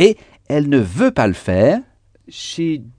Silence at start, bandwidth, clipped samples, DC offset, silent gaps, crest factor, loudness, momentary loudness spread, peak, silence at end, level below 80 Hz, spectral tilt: 0 s; 10 kHz; under 0.1%; under 0.1%; none; 16 dB; -17 LUFS; 13 LU; 0 dBFS; 0.1 s; -46 dBFS; -6.5 dB/octave